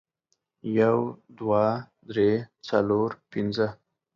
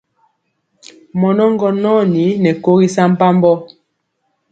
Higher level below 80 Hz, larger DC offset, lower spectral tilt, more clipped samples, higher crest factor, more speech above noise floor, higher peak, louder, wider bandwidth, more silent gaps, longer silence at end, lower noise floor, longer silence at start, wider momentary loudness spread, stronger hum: about the same, -62 dBFS vs -60 dBFS; neither; about the same, -8 dB/octave vs -7.5 dB/octave; neither; about the same, 18 dB vs 14 dB; second, 51 dB vs 56 dB; second, -8 dBFS vs 0 dBFS; second, -26 LUFS vs -13 LUFS; second, 7.2 kHz vs 9 kHz; neither; second, 0.4 s vs 0.85 s; first, -76 dBFS vs -68 dBFS; second, 0.65 s vs 1.15 s; first, 11 LU vs 5 LU; neither